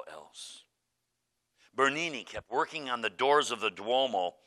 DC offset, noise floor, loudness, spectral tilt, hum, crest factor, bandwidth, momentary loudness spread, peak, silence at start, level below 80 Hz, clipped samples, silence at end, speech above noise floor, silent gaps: under 0.1%; -82 dBFS; -30 LUFS; -2.5 dB/octave; none; 20 dB; 12.5 kHz; 19 LU; -12 dBFS; 0 s; -72 dBFS; under 0.1%; 0.15 s; 51 dB; none